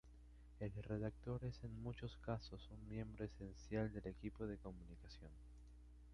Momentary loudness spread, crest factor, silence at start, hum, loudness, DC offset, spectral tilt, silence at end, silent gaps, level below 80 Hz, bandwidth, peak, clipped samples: 17 LU; 20 dB; 0.05 s; 60 Hz at -60 dBFS; -50 LUFS; under 0.1%; -8 dB/octave; 0 s; none; -60 dBFS; 10.5 kHz; -30 dBFS; under 0.1%